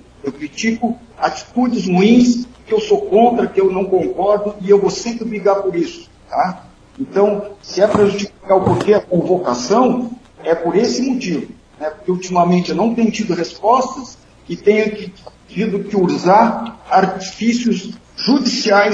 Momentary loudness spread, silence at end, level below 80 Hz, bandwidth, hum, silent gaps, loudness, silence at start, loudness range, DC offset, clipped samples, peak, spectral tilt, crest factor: 13 LU; 0 s; -50 dBFS; 8.4 kHz; none; none; -16 LUFS; 0.25 s; 3 LU; under 0.1%; under 0.1%; 0 dBFS; -5.5 dB/octave; 16 dB